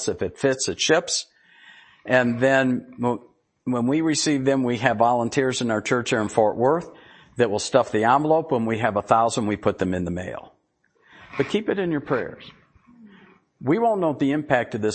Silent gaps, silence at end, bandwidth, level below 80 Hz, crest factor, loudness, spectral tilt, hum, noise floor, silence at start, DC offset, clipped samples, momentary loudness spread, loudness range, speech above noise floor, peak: none; 0 s; 8.8 kHz; -58 dBFS; 22 dB; -22 LUFS; -4.5 dB/octave; none; -66 dBFS; 0 s; under 0.1%; under 0.1%; 9 LU; 6 LU; 44 dB; -2 dBFS